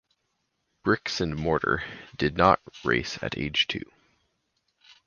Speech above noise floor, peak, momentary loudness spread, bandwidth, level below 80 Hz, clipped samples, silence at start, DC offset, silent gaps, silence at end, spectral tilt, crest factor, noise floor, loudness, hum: 50 dB; -4 dBFS; 10 LU; 7.2 kHz; -48 dBFS; under 0.1%; 0.85 s; under 0.1%; none; 1.2 s; -5 dB/octave; 26 dB; -77 dBFS; -26 LUFS; none